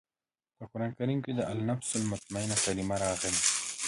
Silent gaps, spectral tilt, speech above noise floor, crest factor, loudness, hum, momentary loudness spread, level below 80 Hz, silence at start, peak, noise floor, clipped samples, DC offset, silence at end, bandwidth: none; -3.5 dB/octave; over 58 dB; 24 dB; -31 LUFS; none; 10 LU; -58 dBFS; 0.6 s; -8 dBFS; under -90 dBFS; under 0.1%; under 0.1%; 0 s; 11.5 kHz